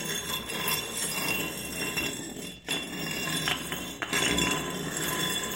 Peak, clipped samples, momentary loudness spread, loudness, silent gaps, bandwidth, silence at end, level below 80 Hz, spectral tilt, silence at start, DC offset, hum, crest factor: -10 dBFS; under 0.1%; 7 LU; -29 LUFS; none; 17 kHz; 0 s; -52 dBFS; -2 dB/octave; 0 s; under 0.1%; none; 20 dB